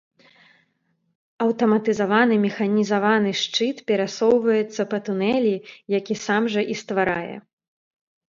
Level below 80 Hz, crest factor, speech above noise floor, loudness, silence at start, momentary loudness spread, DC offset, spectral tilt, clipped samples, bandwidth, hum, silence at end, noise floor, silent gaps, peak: -66 dBFS; 18 dB; 49 dB; -21 LUFS; 1.4 s; 7 LU; under 0.1%; -5 dB/octave; under 0.1%; 7.6 kHz; none; 0.95 s; -70 dBFS; none; -4 dBFS